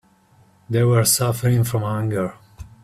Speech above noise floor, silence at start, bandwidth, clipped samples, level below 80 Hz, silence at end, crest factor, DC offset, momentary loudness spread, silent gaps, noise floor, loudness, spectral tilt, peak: 36 dB; 0.7 s; 16 kHz; under 0.1%; -50 dBFS; 0.15 s; 18 dB; under 0.1%; 9 LU; none; -55 dBFS; -19 LUFS; -5 dB/octave; -4 dBFS